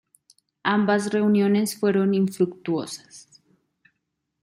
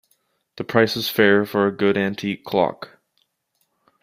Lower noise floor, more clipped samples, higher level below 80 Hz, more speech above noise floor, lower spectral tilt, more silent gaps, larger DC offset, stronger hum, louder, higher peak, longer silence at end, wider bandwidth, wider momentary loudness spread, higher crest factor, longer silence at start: first, -78 dBFS vs -71 dBFS; neither; second, -70 dBFS vs -62 dBFS; first, 56 dB vs 51 dB; about the same, -6 dB/octave vs -5.5 dB/octave; neither; neither; neither; about the same, -22 LUFS vs -20 LUFS; second, -6 dBFS vs -2 dBFS; about the same, 1.2 s vs 1.15 s; about the same, 15.5 kHz vs 16 kHz; second, 9 LU vs 14 LU; about the same, 18 dB vs 20 dB; about the same, 0.65 s vs 0.55 s